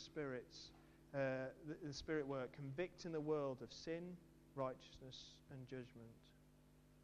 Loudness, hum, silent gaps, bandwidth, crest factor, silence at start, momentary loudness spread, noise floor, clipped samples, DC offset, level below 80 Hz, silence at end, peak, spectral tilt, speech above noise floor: -49 LUFS; 50 Hz at -70 dBFS; none; 13.5 kHz; 20 dB; 0 s; 16 LU; -69 dBFS; under 0.1%; under 0.1%; -72 dBFS; 0 s; -30 dBFS; -6 dB/octave; 21 dB